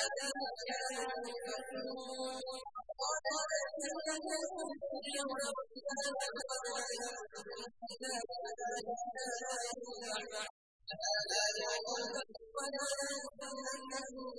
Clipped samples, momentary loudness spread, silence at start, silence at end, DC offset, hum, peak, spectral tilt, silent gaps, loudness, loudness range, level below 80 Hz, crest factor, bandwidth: under 0.1%; 8 LU; 0 s; 0 s; under 0.1%; none; -22 dBFS; 0 dB/octave; 10.50-10.80 s; -40 LUFS; 4 LU; -78 dBFS; 18 dB; 11 kHz